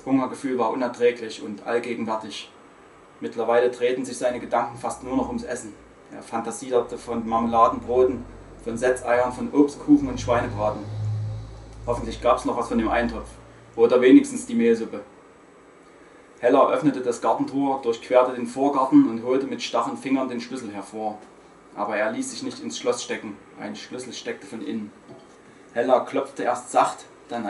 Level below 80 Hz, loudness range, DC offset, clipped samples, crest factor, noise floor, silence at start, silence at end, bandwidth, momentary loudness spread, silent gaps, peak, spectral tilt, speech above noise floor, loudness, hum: -50 dBFS; 8 LU; under 0.1%; under 0.1%; 20 dB; -50 dBFS; 0.05 s; 0 s; 11.5 kHz; 16 LU; none; -4 dBFS; -5.5 dB/octave; 27 dB; -23 LUFS; none